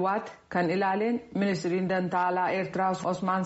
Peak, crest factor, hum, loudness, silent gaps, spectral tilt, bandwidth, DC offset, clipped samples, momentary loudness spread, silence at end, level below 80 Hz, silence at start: -14 dBFS; 14 dB; none; -28 LUFS; none; -5.5 dB/octave; 8 kHz; under 0.1%; under 0.1%; 3 LU; 0 s; -66 dBFS; 0 s